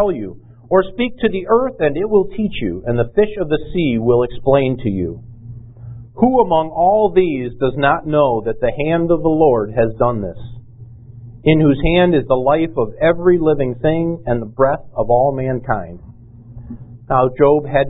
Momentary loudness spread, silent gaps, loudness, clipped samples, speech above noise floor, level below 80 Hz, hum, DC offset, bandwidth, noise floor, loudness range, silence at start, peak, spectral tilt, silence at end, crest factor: 14 LU; none; -16 LUFS; under 0.1%; 23 dB; -36 dBFS; none; under 0.1%; 4 kHz; -38 dBFS; 3 LU; 0 s; 0 dBFS; -12.5 dB/octave; 0 s; 16 dB